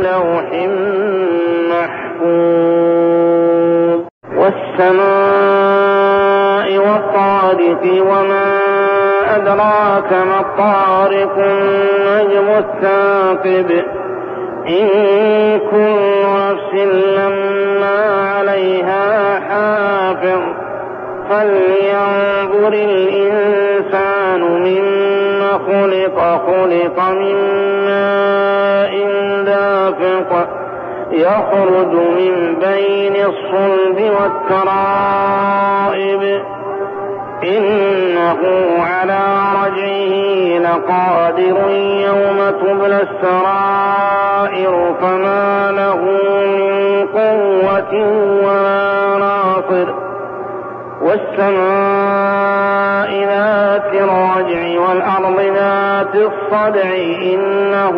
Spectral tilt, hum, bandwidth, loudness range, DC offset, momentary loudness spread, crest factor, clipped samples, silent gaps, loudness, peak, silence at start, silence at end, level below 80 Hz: -3.5 dB/octave; none; 5.2 kHz; 3 LU; under 0.1%; 4 LU; 10 dB; under 0.1%; 4.11-4.21 s; -13 LUFS; -2 dBFS; 0 s; 0 s; -58 dBFS